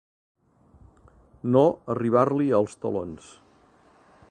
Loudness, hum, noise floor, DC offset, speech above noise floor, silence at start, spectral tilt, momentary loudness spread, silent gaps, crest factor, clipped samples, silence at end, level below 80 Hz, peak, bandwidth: -24 LUFS; none; -58 dBFS; under 0.1%; 35 dB; 1.45 s; -8.5 dB/octave; 14 LU; none; 20 dB; under 0.1%; 1.15 s; -60 dBFS; -6 dBFS; 9.6 kHz